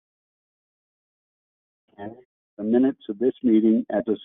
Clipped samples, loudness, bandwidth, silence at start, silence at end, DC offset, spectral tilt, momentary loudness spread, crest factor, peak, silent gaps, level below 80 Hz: under 0.1%; -22 LUFS; 3.8 kHz; 2 s; 0.05 s; under 0.1%; -7 dB/octave; 21 LU; 18 dB; -8 dBFS; 2.25-2.57 s; -68 dBFS